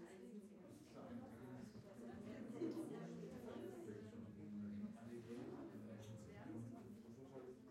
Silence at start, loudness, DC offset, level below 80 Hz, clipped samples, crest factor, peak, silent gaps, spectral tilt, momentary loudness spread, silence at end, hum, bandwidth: 0 s; -55 LUFS; under 0.1%; -82 dBFS; under 0.1%; 18 dB; -36 dBFS; none; -7 dB/octave; 8 LU; 0 s; none; 16 kHz